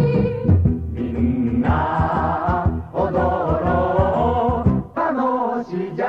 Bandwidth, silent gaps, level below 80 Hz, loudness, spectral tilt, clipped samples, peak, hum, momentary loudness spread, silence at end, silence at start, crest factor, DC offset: 5.6 kHz; none; -30 dBFS; -20 LUFS; -10 dB/octave; under 0.1%; -4 dBFS; none; 5 LU; 0 s; 0 s; 16 dB; 0.1%